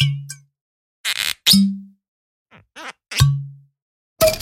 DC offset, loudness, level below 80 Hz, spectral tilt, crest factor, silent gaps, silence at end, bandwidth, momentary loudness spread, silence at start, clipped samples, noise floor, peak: under 0.1%; -18 LUFS; -42 dBFS; -4 dB/octave; 22 dB; 0.61-1.04 s, 2.08-2.46 s, 3.82-4.16 s; 0 s; 16.5 kHz; 23 LU; 0 s; under 0.1%; -38 dBFS; 0 dBFS